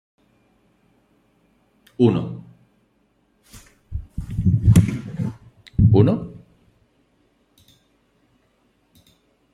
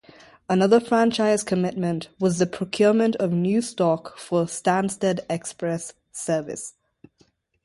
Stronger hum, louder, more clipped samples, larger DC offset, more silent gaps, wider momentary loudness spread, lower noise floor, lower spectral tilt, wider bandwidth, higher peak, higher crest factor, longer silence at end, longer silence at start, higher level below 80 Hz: neither; first, -20 LUFS vs -23 LUFS; neither; neither; neither; first, 22 LU vs 11 LU; about the same, -64 dBFS vs -63 dBFS; first, -8.5 dB/octave vs -5.5 dB/octave; about the same, 12 kHz vs 11.5 kHz; first, 0 dBFS vs -6 dBFS; first, 22 dB vs 16 dB; first, 3.15 s vs 0.95 s; first, 2 s vs 0.5 s; first, -38 dBFS vs -62 dBFS